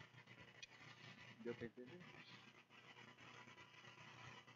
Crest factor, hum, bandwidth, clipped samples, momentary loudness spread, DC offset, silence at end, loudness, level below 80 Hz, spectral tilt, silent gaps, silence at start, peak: 22 dB; 60 Hz at -75 dBFS; 7.4 kHz; under 0.1%; 9 LU; under 0.1%; 0 s; -59 LUFS; -88 dBFS; -3.5 dB/octave; none; 0 s; -36 dBFS